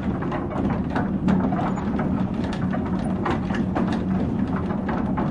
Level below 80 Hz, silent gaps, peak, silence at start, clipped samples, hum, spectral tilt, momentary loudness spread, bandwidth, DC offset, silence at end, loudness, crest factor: -38 dBFS; none; -8 dBFS; 0 s; under 0.1%; none; -8.5 dB/octave; 4 LU; 10 kHz; under 0.1%; 0 s; -24 LUFS; 14 dB